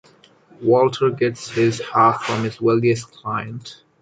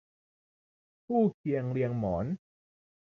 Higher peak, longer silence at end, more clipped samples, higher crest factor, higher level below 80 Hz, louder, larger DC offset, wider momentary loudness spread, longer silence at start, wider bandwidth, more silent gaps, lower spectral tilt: first, -2 dBFS vs -16 dBFS; second, 0.3 s vs 0.65 s; neither; about the same, 18 dB vs 18 dB; about the same, -58 dBFS vs -58 dBFS; first, -19 LUFS vs -31 LUFS; neither; first, 11 LU vs 7 LU; second, 0.6 s vs 1.1 s; first, 9.2 kHz vs 6.4 kHz; second, none vs 1.34-1.44 s; second, -6 dB/octave vs -11 dB/octave